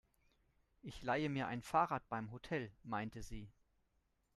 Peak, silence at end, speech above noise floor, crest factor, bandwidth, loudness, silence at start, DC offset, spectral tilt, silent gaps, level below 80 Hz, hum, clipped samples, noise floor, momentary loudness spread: -20 dBFS; 0.85 s; 40 dB; 22 dB; 13 kHz; -41 LUFS; 0.85 s; under 0.1%; -6 dB/octave; none; -64 dBFS; none; under 0.1%; -81 dBFS; 18 LU